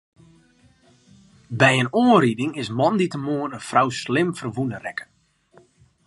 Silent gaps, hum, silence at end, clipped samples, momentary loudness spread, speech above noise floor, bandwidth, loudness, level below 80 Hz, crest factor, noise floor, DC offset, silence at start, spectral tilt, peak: none; none; 1 s; under 0.1%; 12 LU; 36 dB; 11.5 kHz; -21 LUFS; -62 dBFS; 22 dB; -57 dBFS; under 0.1%; 1.5 s; -5.5 dB/octave; 0 dBFS